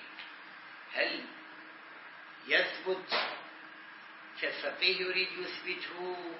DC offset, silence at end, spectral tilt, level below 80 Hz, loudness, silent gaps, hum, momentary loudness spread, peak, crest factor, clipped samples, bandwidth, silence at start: under 0.1%; 0 s; 1 dB/octave; under -90 dBFS; -33 LUFS; none; none; 20 LU; -14 dBFS; 24 dB; under 0.1%; 5.8 kHz; 0 s